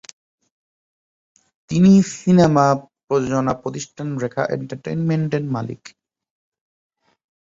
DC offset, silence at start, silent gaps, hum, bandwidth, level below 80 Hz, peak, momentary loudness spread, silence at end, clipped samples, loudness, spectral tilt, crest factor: under 0.1%; 1.7 s; 3.04-3.08 s; none; 7.8 kHz; -54 dBFS; -2 dBFS; 14 LU; 1.65 s; under 0.1%; -19 LUFS; -7 dB/octave; 18 dB